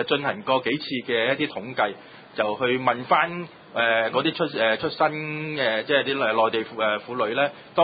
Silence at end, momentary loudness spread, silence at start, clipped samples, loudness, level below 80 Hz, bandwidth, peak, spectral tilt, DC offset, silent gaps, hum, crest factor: 0 s; 6 LU; 0 s; under 0.1%; -24 LUFS; -66 dBFS; 5 kHz; -6 dBFS; -9 dB/octave; under 0.1%; none; none; 18 dB